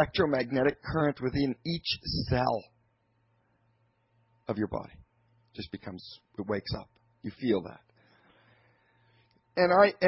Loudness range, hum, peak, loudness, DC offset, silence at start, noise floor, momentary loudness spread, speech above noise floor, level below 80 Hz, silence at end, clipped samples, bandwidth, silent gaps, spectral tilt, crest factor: 11 LU; none; -8 dBFS; -30 LUFS; under 0.1%; 0 s; -72 dBFS; 18 LU; 43 dB; -52 dBFS; 0 s; under 0.1%; 5.8 kHz; none; -9.5 dB/octave; 22 dB